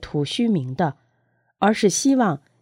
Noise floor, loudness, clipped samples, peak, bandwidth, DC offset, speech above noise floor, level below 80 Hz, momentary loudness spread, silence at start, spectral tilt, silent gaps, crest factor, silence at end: -67 dBFS; -21 LUFS; under 0.1%; -4 dBFS; 16 kHz; under 0.1%; 47 dB; -54 dBFS; 7 LU; 0 s; -5 dB/octave; none; 18 dB; 0.25 s